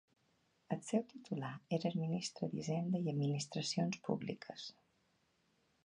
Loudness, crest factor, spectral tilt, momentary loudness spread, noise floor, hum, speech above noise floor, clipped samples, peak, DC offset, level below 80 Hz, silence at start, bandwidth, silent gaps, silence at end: -40 LUFS; 20 dB; -5.5 dB/octave; 8 LU; -78 dBFS; none; 38 dB; under 0.1%; -20 dBFS; under 0.1%; -80 dBFS; 0.7 s; 11 kHz; none; 1.15 s